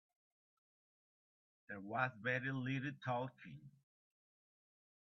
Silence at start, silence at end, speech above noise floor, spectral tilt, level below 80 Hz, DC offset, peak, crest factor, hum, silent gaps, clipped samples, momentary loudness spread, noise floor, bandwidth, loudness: 1.7 s; 1.35 s; over 47 dB; -5 dB/octave; -84 dBFS; under 0.1%; -24 dBFS; 24 dB; none; none; under 0.1%; 17 LU; under -90 dBFS; 6.2 kHz; -42 LUFS